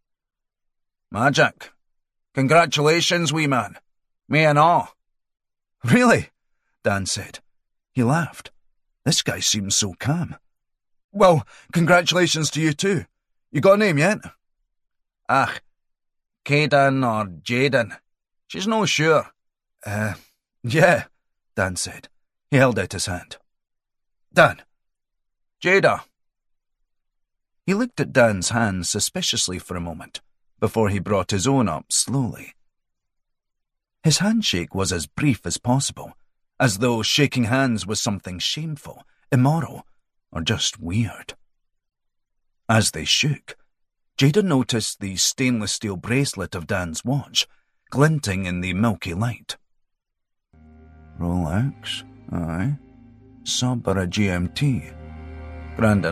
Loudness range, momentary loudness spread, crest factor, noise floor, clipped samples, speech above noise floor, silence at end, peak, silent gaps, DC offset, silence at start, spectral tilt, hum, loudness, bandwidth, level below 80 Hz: 5 LU; 16 LU; 20 dB; -78 dBFS; under 0.1%; 58 dB; 0 s; -2 dBFS; 11.04-11.09 s; under 0.1%; 1.1 s; -4 dB/octave; none; -21 LUFS; 15 kHz; -54 dBFS